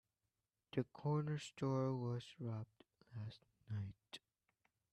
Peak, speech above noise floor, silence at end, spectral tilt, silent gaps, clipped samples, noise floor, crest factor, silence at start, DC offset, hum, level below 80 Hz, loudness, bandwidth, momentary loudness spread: -28 dBFS; over 47 dB; 0.75 s; -7.5 dB/octave; none; under 0.1%; under -90 dBFS; 18 dB; 0.75 s; under 0.1%; none; -78 dBFS; -45 LUFS; 10.5 kHz; 17 LU